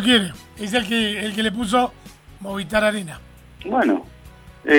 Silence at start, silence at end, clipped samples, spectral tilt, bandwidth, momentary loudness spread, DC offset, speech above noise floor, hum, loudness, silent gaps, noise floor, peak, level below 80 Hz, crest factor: 0 s; 0 s; under 0.1%; -4 dB/octave; 19.5 kHz; 14 LU; under 0.1%; 23 dB; none; -21 LUFS; none; -44 dBFS; -2 dBFS; -48 dBFS; 18 dB